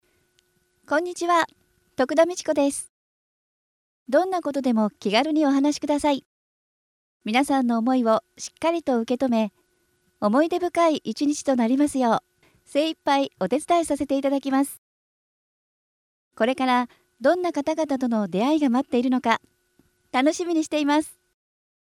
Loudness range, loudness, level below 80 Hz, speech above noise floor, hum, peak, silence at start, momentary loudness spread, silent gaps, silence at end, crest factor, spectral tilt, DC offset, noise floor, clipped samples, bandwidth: 3 LU; -23 LUFS; -64 dBFS; 45 dB; none; -6 dBFS; 0.9 s; 6 LU; 2.89-4.06 s, 6.25-7.20 s, 14.78-16.31 s; 0.85 s; 18 dB; -4.5 dB/octave; under 0.1%; -68 dBFS; under 0.1%; 14 kHz